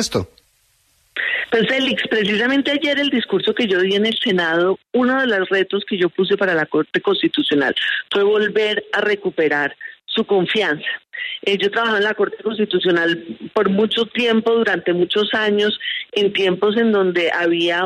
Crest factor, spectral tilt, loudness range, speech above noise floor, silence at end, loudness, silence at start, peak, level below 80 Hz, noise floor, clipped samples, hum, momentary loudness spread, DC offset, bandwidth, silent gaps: 14 dB; -4.5 dB/octave; 2 LU; 42 dB; 0 s; -18 LUFS; 0 s; -4 dBFS; -60 dBFS; -60 dBFS; under 0.1%; none; 6 LU; under 0.1%; 12.5 kHz; none